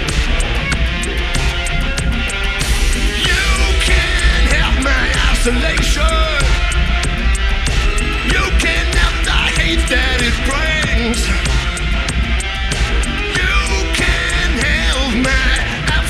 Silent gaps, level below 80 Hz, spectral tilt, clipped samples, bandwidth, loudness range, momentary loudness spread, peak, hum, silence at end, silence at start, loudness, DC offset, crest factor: none; -16 dBFS; -3.5 dB/octave; under 0.1%; 13.5 kHz; 2 LU; 4 LU; 0 dBFS; none; 0 s; 0 s; -15 LUFS; under 0.1%; 14 dB